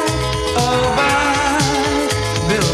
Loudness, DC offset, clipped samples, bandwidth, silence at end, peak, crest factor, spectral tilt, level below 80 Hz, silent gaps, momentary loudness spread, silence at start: -16 LUFS; under 0.1%; under 0.1%; 15 kHz; 0 s; -4 dBFS; 12 dB; -4 dB/octave; -32 dBFS; none; 4 LU; 0 s